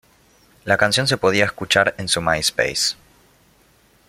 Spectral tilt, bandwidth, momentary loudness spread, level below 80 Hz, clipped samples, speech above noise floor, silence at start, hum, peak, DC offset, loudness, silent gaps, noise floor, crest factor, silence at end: -2.5 dB/octave; 16.5 kHz; 5 LU; -50 dBFS; under 0.1%; 37 dB; 0.65 s; none; -2 dBFS; under 0.1%; -18 LUFS; none; -56 dBFS; 20 dB; 1.15 s